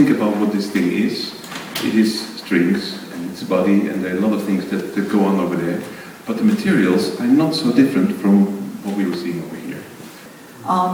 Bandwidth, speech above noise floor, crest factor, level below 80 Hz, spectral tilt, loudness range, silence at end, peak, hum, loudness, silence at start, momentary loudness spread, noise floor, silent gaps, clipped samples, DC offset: 19.5 kHz; 22 dB; 16 dB; -62 dBFS; -6 dB/octave; 3 LU; 0 s; -2 dBFS; none; -18 LUFS; 0 s; 15 LU; -39 dBFS; none; under 0.1%; under 0.1%